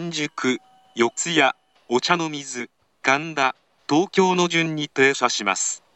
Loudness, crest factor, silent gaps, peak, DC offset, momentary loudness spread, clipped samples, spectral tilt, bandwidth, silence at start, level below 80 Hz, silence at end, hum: -21 LUFS; 18 dB; none; -4 dBFS; under 0.1%; 12 LU; under 0.1%; -3 dB/octave; 8.8 kHz; 0 s; -74 dBFS; 0.2 s; none